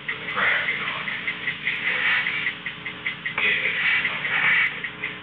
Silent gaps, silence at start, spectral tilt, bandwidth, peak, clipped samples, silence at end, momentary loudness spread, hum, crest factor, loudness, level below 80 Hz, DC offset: none; 0 s; -5 dB/octave; 5.8 kHz; -12 dBFS; under 0.1%; 0 s; 10 LU; 60 Hz at -60 dBFS; 14 dB; -22 LUFS; -62 dBFS; under 0.1%